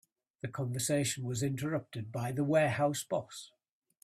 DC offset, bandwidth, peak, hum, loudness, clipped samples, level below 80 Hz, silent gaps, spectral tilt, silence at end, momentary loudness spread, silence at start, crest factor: under 0.1%; 15.5 kHz; -16 dBFS; none; -33 LUFS; under 0.1%; -68 dBFS; none; -5 dB/octave; 0.6 s; 13 LU; 0.45 s; 18 dB